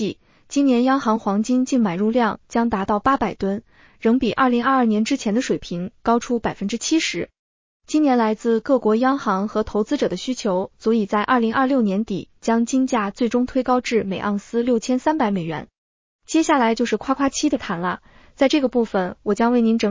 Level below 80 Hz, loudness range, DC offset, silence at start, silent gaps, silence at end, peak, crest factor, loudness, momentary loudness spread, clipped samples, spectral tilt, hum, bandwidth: -52 dBFS; 2 LU; under 0.1%; 0 s; 7.39-7.80 s, 15.78-16.19 s; 0 s; -4 dBFS; 16 dB; -20 LUFS; 7 LU; under 0.1%; -5 dB/octave; none; 7.6 kHz